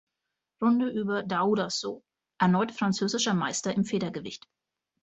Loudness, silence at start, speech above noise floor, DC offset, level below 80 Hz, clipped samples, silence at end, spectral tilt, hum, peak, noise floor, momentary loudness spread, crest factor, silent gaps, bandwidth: -28 LUFS; 0.6 s; 58 dB; under 0.1%; -68 dBFS; under 0.1%; 0.65 s; -4.5 dB/octave; none; -8 dBFS; -85 dBFS; 13 LU; 20 dB; none; 8.2 kHz